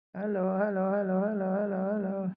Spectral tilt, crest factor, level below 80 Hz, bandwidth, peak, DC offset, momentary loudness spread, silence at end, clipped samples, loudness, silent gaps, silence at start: -13 dB/octave; 14 dB; -74 dBFS; 2.9 kHz; -16 dBFS; under 0.1%; 3 LU; 0 s; under 0.1%; -30 LUFS; none; 0.15 s